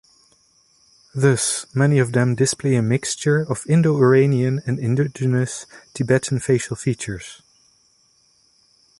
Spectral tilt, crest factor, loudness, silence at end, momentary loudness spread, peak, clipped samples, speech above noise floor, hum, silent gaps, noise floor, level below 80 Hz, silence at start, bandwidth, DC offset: -5.5 dB/octave; 18 dB; -19 LUFS; 1.65 s; 12 LU; -4 dBFS; under 0.1%; 41 dB; none; none; -59 dBFS; -54 dBFS; 1.15 s; 11.5 kHz; under 0.1%